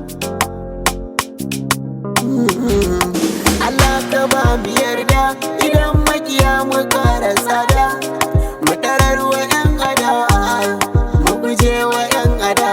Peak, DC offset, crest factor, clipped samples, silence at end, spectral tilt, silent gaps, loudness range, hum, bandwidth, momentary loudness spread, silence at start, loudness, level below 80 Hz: 0 dBFS; under 0.1%; 14 dB; under 0.1%; 0 s; -4.5 dB/octave; none; 2 LU; none; 19.5 kHz; 6 LU; 0 s; -15 LUFS; -24 dBFS